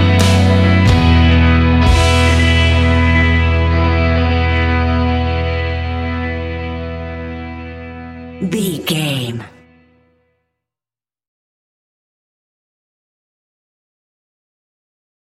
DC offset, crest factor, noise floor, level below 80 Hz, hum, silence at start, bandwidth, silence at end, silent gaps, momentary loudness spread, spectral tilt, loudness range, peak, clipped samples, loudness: under 0.1%; 14 dB; under -90 dBFS; -22 dBFS; none; 0 s; 13 kHz; 5.75 s; none; 15 LU; -6 dB/octave; 12 LU; -2 dBFS; under 0.1%; -13 LUFS